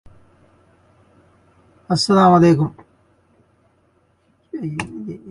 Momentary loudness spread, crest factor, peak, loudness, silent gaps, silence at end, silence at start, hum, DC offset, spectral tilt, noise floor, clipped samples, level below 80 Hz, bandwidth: 19 LU; 20 dB; 0 dBFS; -17 LUFS; none; 0 s; 1.9 s; none; under 0.1%; -6.5 dB/octave; -61 dBFS; under 0.1%; -54 dBFS; 11.5 kHz